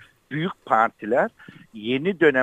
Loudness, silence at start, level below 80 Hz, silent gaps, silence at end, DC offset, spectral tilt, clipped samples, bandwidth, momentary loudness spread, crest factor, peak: -23 LUFS; 0.3 s; -66 dBFS; none; 0 s; under 0.1%; -7 dB/octave; under 0.1%; 9.2 kHz; 14 LU; 20 dB; -4 dBFS